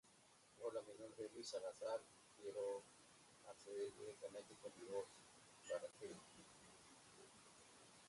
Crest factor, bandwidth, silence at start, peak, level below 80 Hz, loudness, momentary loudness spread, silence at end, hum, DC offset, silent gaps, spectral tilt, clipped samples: 18 dB; 11.5 kHz; 0.05 s; -36 dBFS; -88 dBFS; -53 LUFS; 15 LU; 0 s; none; under 0.1%; none; -3 dB/octave; under 0.1%